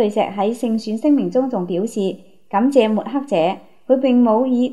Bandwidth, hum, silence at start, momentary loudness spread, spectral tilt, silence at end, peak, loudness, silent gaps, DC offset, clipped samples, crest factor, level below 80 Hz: 12 kHz; none; 0 s; 8 LU; -7 dB/octave; 0 s; -2 dBFS; -18 LUFS; none; 0.5%; under 0.1%; 16 dB; -70 dBFS